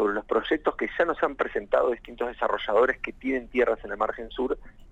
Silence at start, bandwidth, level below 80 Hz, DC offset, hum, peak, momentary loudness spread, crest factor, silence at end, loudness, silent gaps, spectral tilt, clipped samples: 0 s; 8 kHz; -50 dBFS; under 0.1%; none; -10 dBFS; 7 LU; 16 dB; 0 s; -27 LUFS; none; -5.5 dB/octave; under 0.1%